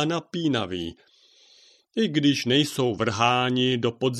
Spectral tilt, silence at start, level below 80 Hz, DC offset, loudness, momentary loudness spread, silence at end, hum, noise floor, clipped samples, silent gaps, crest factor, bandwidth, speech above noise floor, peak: -5 dB/octave; 0 s; -60 dBFS; under 0.1%; -24 LUFS; 10 LU; 0 s; none; -57 dBFS; under 0.1%; none; 20 dB; 14 kHz; 33 dB; -6 dBFS